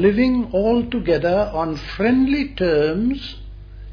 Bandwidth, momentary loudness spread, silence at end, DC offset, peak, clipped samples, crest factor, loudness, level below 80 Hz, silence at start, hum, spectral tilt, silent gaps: 5.4 kHz; 14 LU; 0 s; under 0.1%; -4 dBFS; under 0.1%; 14 dB; -19 LUFS; -36 dBFS; 0 s; none; -8 dB/octave; none